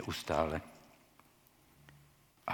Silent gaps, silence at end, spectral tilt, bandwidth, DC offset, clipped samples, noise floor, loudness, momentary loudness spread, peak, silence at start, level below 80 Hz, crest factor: none; 0 s; -5 dB/octave; 19 kHz; under 0.1%; under 0.1%; -66 dBFS; -37 LUFS; 27 LU; -16 dBFS; 0 s; -60 dBFS; 26 dB